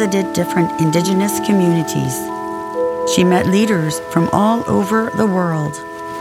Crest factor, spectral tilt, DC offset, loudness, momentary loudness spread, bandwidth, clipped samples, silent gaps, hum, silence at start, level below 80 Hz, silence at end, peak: 16 dB; -5.5 dB/octave; under 0.1%; -16 LUFS; 9 LU; 17 kHz; under 0.1%; none; none; 0 s; -50 dBFS; 0 s; 0 dBFS